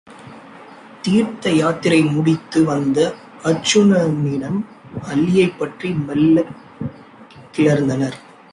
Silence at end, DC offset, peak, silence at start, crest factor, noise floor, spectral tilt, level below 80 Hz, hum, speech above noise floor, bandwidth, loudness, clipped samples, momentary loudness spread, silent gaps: 0.3 s; under 0.1%; -2 dBFS; 0.1 s; 16 dB; -42 dBFS; -6 dB/octave; -54 dBFS; none; 25 dB; 11.5 kHz; -17 LUFS; under 0.1%; 15 LU; none